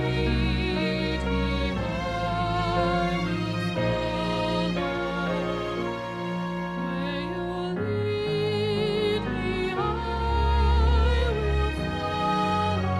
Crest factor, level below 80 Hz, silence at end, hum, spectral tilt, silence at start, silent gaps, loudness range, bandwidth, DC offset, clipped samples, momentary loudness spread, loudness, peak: 14 dB; -32 dBFS; 0 s; none; -7 dB/octave; 0 s; none; 4 LU; 11.5 kHz; under 0.1%; under 0.1%; 6 LU; -26 LUFS; -12 dBFS